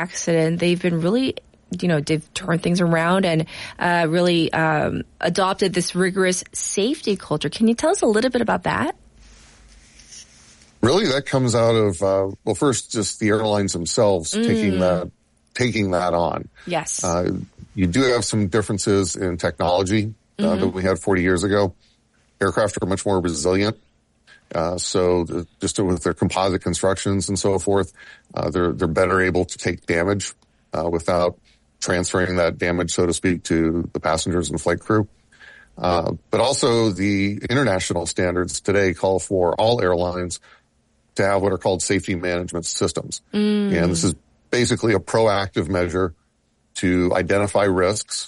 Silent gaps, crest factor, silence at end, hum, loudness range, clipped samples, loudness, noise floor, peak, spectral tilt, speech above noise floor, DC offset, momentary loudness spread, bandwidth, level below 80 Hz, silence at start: none; 14 dB; 0 s; none; 3 LU; under 0.1%; -21 LUFS; -65 dBFS; -6 dBFS; -5 dB/octave; 45 dB; under 0.1%; 7 LU; 11.5 kHz; -46 dBFS; 0 s